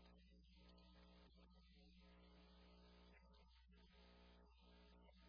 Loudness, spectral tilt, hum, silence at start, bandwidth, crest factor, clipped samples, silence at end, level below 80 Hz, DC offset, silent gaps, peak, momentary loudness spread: -70 LUFS; -4.5 dB/octave; none; 0 s; 5.4 kHz; 12 dB; under 0.1%; 0 s; -72 dBFS; under 0.1%; none; -56 dBFS; 0 LU